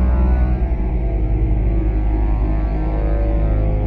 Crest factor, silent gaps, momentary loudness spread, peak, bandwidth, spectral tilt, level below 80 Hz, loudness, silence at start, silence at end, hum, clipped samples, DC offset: 10 dB; none; 4 LU; -6 dBFS; 3 kHz; -11.5 dB/octave; -16 dBFS; -20 LUFS; 0 s; 0 s; none; under 0.1%; under 0.1%